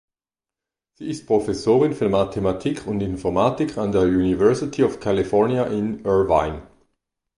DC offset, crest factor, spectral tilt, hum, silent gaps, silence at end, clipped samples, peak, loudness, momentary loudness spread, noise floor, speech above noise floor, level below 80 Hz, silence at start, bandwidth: under 0.1%; 18 dB; -7 dB/octave; none; none; 0.75 s; under 0.1%; -4 dBFS; -21 LUFS; 8 LU; under -90 dBFS; over 70 dB; -44 dBFS; 1 s; 11 kHz